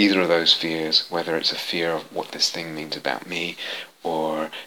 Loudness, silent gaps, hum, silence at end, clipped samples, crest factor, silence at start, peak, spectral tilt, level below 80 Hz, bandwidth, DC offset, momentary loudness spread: -23 LUFS; none; none; 0 s; under 0.1%; 22 dB; 0 s; -2 dBFS; -3 dB/octave; -74 dBFS; 18.5 kHz; 0.1%; 13 LU